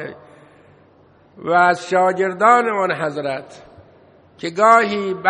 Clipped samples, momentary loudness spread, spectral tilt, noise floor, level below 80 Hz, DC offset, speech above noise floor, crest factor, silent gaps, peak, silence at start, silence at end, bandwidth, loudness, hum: under 0.1%; 17 LU; -5 dB/octave; -51 dBFS; -64 dBFS; under 0.1%; 34 dB; 18 dB; none; 0 dBFS; 0 s; 0 s; 10.5 kHz; -16 LUFS; none